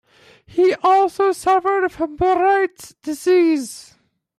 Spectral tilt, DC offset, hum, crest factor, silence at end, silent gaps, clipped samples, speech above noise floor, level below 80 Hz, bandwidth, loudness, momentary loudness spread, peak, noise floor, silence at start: -4.5 dB/octave; under 0.1%; none; 12 dB; 0.55 s; none; under 0.1%; 31 dB; -52 dBFS; 14 kHz; -17 LUFS; 13 LU; -6 dBFS; -49 dBFS; 0.55 s